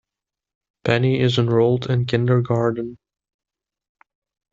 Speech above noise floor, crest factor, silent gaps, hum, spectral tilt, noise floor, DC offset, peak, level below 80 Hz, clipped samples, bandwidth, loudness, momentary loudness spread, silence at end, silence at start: 69 dB; 18 dB; none; none; -7.5 dB/octave; -87 dBFS; under 0.1%; -4 dBFS; -56 dBFS; under 0.1%; 7.6 kHz; -20 LUFS; 9 LU; 1.55 s; 0.85 s